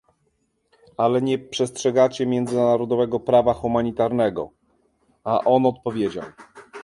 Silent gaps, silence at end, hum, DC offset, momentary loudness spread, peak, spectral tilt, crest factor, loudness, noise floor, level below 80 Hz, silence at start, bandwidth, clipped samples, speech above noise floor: none; 0 s; none; under 0.1%; 15 LU; -4 dBFS; -6 dB/octave; 18 dB; -21 LUFS; -69 dBFS; -54 dBFS; 1 s; 11.5 kHz; under 0.1%; 48 dB